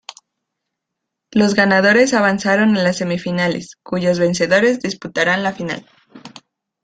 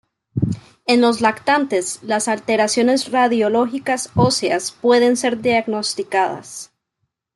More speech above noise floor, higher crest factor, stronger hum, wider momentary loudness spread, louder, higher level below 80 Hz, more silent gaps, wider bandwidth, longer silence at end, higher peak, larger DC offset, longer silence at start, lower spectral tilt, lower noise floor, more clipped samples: first, 63 dB vs 57 dB; about the same, 16 dB vs 16 dB; neither; first, 11 LU vs 8 LU; about the same, -16 LUFS vs -18 LUFS; about the same, -56 dBFS vs -54 dBFS; neither; second, 9.4 kHz vs 12 kHz; second, 0.55 s vs 0.7 s; about the same, -2 dBFS vs -2 dBFS; neither; first, 1.35 s vs 0.35 s; about the same, -5 dB/octave vs -4 dB/octave; first, -79 dBFS vs -75 dBFS; neither